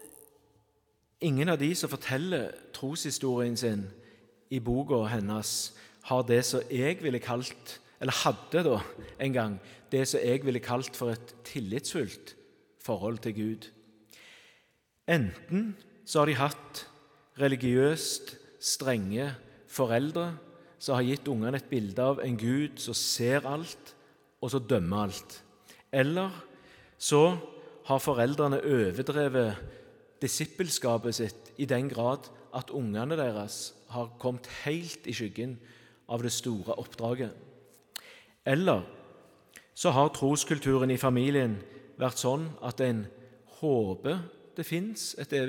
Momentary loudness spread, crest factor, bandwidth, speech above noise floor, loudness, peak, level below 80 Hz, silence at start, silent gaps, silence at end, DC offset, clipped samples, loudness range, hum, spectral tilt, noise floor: 14 LU; 22 dB; 18 kHz; 42 dB; -30 LUFS; -10 dBFS; -64 dBFS; 0 s; none; 0 s; under 0.1%; under 0.1%; 7 LU; none; -5 dB/octave; -72 dBFS